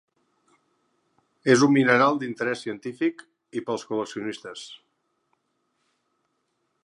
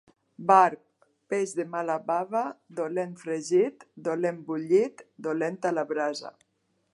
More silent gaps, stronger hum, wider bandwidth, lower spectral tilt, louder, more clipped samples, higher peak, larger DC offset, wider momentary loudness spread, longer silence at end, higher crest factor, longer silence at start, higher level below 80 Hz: neither; neither; about the same, 11 kHz vs 11.5 kHz; about the same, -5 dB/octave vs -5.5 dB/octave; first, -24 LUFS vs -27 LUFS; neither; about the same, -4 dBFS vs -6 dBFS; neither; first, 18 LU vs 13 LU; first, 2.1 s vs 0.65 s; about the same, 24 dB vs 22 dB; first, 1.45 s vs 0.4 s; first, -78 dBFS vs -84 dBFS